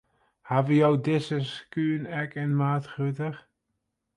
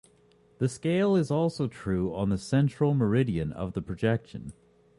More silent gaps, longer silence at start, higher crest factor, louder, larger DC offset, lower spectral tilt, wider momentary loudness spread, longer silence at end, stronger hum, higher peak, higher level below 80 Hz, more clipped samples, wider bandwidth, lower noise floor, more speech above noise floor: neither; second, 0.45 s vs 0.6 s; about the same, 18 dB vs 16 dB; about the same, -27 LUFS vs -28 LUFS; neither; about the same, -8 dB/octave vs -7.5 dB/octave; about the same, 11 LU vs 9 LU; first, 0.75 s vs 0.45 s; neither; first, -8 dBFS vs -12 dBFS; second, -70 dBFS vs -50 dBFS; neither; about the same, 10.5 kHz vs 11.5 kHz; first, -80 dBFS vs -61 dBFS; first, 54 dB vs 35 dB